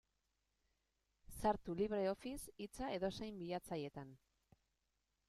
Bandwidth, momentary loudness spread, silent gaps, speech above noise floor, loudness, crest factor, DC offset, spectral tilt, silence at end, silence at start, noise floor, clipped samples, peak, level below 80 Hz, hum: 15 kHz; 12 LU; none; 43 dB; -44 LUFS; 22 dB; under 0.1%; -5.5 dB/octave; 1.1 s; 1.3 s; -86 dBFS; under 0.1%; -24 dBFS; -64 dBFS; none